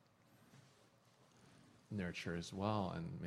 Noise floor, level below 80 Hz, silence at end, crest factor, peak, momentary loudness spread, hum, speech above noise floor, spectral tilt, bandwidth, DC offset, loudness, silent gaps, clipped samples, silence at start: -70 dBFS; -70 dBFS; 0 s; 24 dB; -24 dBFS; 25 LU; none; 28 dB; -6 dB/octave; 13.5 kHz; under 0.1%; -44 LUFS; none; under 0.1%; 0.55 s